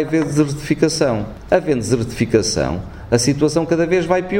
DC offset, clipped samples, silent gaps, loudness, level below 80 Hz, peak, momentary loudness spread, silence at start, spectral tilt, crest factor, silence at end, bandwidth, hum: under 0.1%; under 0.1%; none; -18 LUFS; -38 dBFS; 0 dBFS; 4 LU; 0 s; -5 dB/octave; 18 dB; 0 s; 16.5 kHz; none